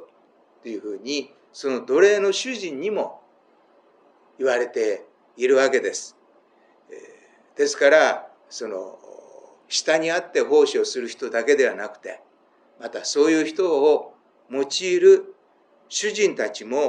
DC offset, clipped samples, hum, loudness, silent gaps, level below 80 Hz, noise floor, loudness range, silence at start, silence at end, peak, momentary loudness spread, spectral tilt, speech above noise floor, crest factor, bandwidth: under 0.1%; under 0.1%; none; -21 LUFS; none; -88 dBFS; -59 dBFS; 4 LU; 0 s; 0 s; -2 dBFS; 17 LU; -2.5 dB/octave; 38 dB; 20 dB; 10 kHz